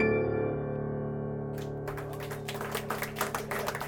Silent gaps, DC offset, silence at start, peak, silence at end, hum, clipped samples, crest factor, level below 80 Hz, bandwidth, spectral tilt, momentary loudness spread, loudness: none; under 0.1%; 0 s; -14 dBFS; 0 s; none; under 0.1%; 18 dB; -54 dBFS; over 20 kHz; -5.5 dB/octave; 7 LU; -34 LUFS